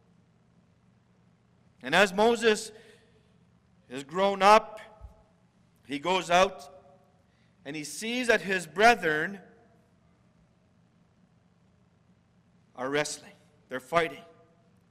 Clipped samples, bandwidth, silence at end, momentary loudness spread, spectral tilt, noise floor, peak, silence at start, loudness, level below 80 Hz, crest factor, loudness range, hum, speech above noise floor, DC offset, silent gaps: under 0.1%; 16 kHz; 0.7 s; 21 LU; -3.5 dB/octave; -64 dBFS; -6 dBFS; 1.85 s; -26 LUFS; -62 dBFS; 24 dB; 11 LU; none; 38 dB; under 0.1%; none